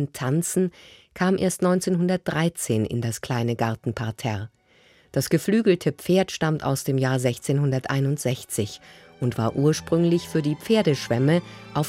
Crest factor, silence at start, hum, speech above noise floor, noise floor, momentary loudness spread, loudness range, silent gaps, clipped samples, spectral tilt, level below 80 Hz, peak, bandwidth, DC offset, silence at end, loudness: 16 dB; 0 s; none; 34 dB; -57 dBFS; 8 LU; 2 LU; none; under 0.1%; -6 dB/octave; -58 dBFS; -8 dBFS; 16.5 kHz; under 0.1%; 0 s; -24 LUFS